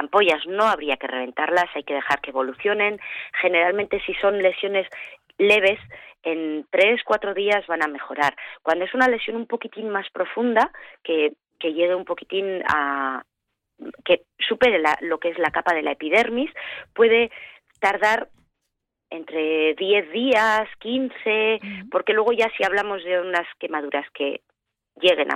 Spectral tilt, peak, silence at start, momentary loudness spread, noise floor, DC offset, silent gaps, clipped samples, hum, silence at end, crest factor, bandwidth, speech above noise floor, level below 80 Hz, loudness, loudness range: -4 dB/octave; -6 dBFS; 0 s; 11 LU; -79 dBFS; under 0.1%; none; under 0.1%; none; 0 s; 16 dB; 13.5 kHz; 57 dB; -60 dBFS; -22 LUFS; 3 LU